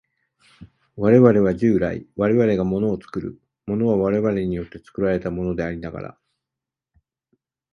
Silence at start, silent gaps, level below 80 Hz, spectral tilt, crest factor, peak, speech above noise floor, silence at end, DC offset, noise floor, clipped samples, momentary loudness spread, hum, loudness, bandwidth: 0.6 s; none; -46 dBFS; -9.5 dB/octave; 20 dB; -2 dBFS; 67 dB; 1.6 s; under 0.1%; -87 dBFS; under 0.1%; 17 LU; none; -20 LUFS; 6.6 kHz